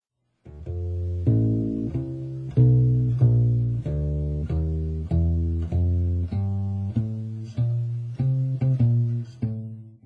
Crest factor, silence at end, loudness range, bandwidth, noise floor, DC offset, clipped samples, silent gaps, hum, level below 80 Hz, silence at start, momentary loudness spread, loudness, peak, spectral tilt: 16 dB; 0.15 s; 4 LU; 2.9 kHz; -51 dBFS; under 0.1%; under 0.1%; none; none; -36 dBFS; 0.45 s; 11 LU; -24 LUFS; -8 dBFS; -11.5 dB/octave